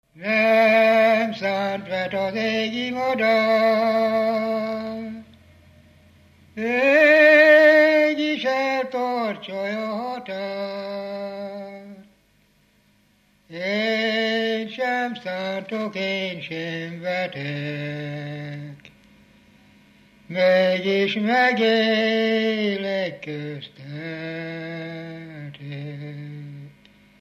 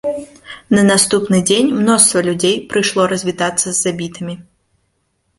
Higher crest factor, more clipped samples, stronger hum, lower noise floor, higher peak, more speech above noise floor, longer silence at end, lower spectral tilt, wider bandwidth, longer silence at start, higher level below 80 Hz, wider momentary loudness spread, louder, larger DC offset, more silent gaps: about the same, 18 dB vs 16 dB; neither; neither; second, -61 dBFS vs -65 dBFS; second, -4 dBFS vs 0 dBFS; second, 38 dB vs 51 dB; second, 0.5 s vs 0.95 s; first, -5.5 dB/octave vs -3.5 dB/octave; about the same, 14.5 kHz vs 15.5 kHz; about the same, 0.15 s vs 0.05 s; second, -68 dBFS vs -52 dBFS; about the same, 19 LU vs 17 LU; second, -21 LUFS vs -14 LUFS; neither; neither